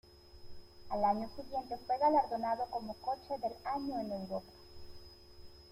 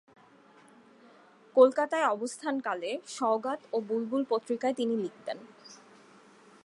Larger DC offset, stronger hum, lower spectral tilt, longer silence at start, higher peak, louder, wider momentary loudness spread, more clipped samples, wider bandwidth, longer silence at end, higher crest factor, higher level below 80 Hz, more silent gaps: neither; neither; first, -6.5 dB/octave vs -4 dB/octave; second, 0.1 s vs 1.55 s; second, -18 dBFS vs -8 dBFS; second, -36 LUFS vs -30 LUFS; first, 25 LU vs 17 LU; neither; first, 16 kHz vs 11.5 kHz; second, 0 s vs 0.9 s; about the same, 20 dB vs 24 dB; first, -62 dBFS vs -88 dBFS; neither